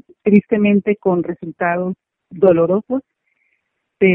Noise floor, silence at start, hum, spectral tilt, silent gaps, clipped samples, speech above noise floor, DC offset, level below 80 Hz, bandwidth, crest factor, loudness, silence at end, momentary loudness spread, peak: -70 dBFS; 0.25 s; none; -11 dB/octave; none; under 0.1%; 54 dB; under 0.1%; -56 dBFS; 3.4 kHz; 16 dB; -17 LUFS; 0 s; 11 LU; 0 dBFS